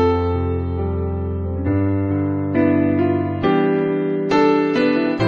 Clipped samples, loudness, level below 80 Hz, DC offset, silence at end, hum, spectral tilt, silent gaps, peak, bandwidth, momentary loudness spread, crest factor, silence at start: under 0.1%; -19 LUFS; -36 dBFS; under 0.1%; 0 s; none; -8.5 dB/octave; none; -4 dBFS; 7 kHz; 7 LU; 14 dB; 0 s